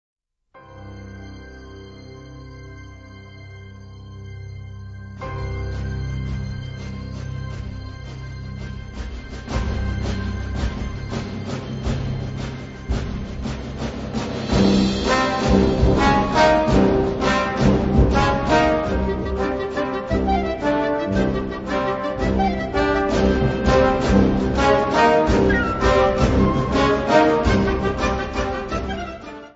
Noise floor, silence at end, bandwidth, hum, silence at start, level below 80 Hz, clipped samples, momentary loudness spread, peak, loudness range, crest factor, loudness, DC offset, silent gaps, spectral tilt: -50 dBFS; 0.05 s; 8 kHz; none; 0.55 s; -30 dBFS; under 0.1%; 22 LU; -2 dBFS; 17 LU; 18 dB; -20 LUFS; under 0.1%; none; -6.5 dB/octave